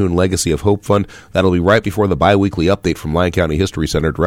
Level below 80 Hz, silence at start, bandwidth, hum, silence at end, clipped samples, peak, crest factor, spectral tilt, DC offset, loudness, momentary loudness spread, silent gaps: -32 dBFS; 0 s; 16 kHz; none; 0 s; under 0.1%; -2 dBFS; 14 dB; -6 dB/octave; under 0.1%; -15 LUFS; 5 LU; none